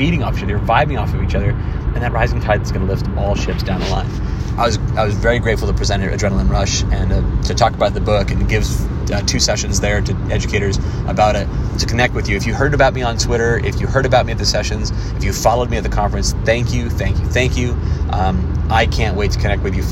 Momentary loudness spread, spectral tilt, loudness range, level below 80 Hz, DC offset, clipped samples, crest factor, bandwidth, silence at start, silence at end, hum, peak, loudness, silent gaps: 5 LU; -5 dB/octave; 2 LU; -22 dBFS; under 0.1%; under 0.1%; 16 dB; 13.5 kHz; 0 s; 0 s; none; 0 dBFS; -17 LUFS; none